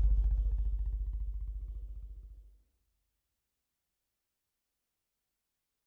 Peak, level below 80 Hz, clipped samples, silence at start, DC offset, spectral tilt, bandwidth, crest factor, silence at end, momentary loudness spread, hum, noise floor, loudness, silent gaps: -20 dBFS; -36 dBFS; under 0.1%; 0 s; under 0.1%; -10 dB/octave; 1 kHz; 16 dB; 3.35 s; 19 LU; none; -86 dBFS; -38 LUFS; none